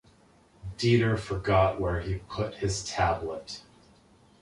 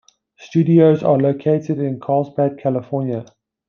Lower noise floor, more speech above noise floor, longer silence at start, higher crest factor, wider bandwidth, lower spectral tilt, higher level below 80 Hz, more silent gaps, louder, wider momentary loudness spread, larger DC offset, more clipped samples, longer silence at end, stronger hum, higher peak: first, -60 dBFS vs -45 dBFS; about the same, 32 dB vs 29 dB; first, 0.65 s vs 0.4 s; about the same, 20 dB vs 16 dB; first, 11.5 kHz vs 6.8 kHz; second, -5.5 dB/octave vs -9.5 dB/octave; first, -44 dBFS vs -64 dBFS; neither; second, -28 LUFS vs -17 LUFS; first, 17 LU vs 10 LU; neither; neither; first, 0.8 s vs 0.45 s; neither; second, -10 dBFS vs -2 dBFS